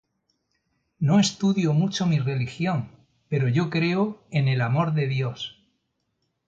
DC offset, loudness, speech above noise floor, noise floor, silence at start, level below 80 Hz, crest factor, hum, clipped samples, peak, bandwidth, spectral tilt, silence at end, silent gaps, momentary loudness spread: under 0.1%; -24 LUFS; 52 dB; -75 dBFS; 1 s; -62 dBFS; 16 dB; none; under 0.1%; -10 dBFS; 8.8 kHz; -6 dB/octave; 1 s; none; 9 LU